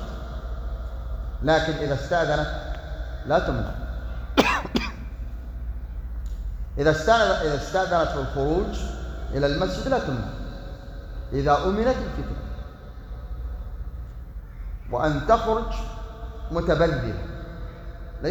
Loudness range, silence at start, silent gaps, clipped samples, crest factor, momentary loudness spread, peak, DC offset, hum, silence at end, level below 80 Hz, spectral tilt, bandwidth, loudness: 4 LU; 0 s; none; under 0.1%; 24 dB; 17 LU; -2 dBFS; under 0.1%; none; 0 s; -32 dBFS; -6 dB/octave; over 20 kHz; -25 LUFS